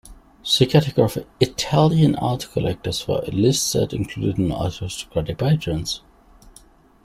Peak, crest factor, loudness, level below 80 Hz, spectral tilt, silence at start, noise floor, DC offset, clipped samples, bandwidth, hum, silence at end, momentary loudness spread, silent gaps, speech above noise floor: -2 dBFS; 18 dB; -21 LUFS; -44 dBFS; -5.5 dB/octave; 0.05 s; -51 dBFS; under 0.1%; under 0.1%; 16 kHz; none; 0.55 s; 10 LU; none; 30 dB